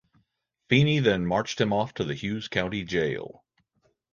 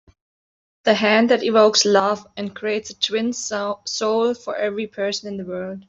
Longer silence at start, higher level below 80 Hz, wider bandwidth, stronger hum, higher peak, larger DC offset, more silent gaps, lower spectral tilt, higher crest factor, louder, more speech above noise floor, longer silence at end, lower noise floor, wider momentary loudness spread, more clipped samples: second, 0.7 s vs 0.85 s; first, -54 dBFS vs -66 dBFS; second, 7.2 kHz vs 8 kHz; neither; about the same, -6 dBFS vs -4 dBFS; neither; neither; first, -6 dB/octave vs -3 dB/octave; about the same, 22 dB vs 18 dB; second, -26 LUFS vs -20 LUFS; second, 49 dB vs over 70 dB; first, 0.85 s vs 0.05 s; second, -74 dBFS vs under -90 dBFS; second, 9 LU vs 12 LU; neither